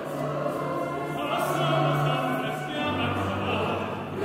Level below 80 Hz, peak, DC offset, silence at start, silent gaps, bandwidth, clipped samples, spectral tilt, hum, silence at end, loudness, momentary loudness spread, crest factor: -60 dBFS; -12 dBFS; under 0.1%; 0 s; none; 16 kHz; under 0.1%; -6 dB/octave; none; 0 s; -27 LUFS; 6 LU; 14 dB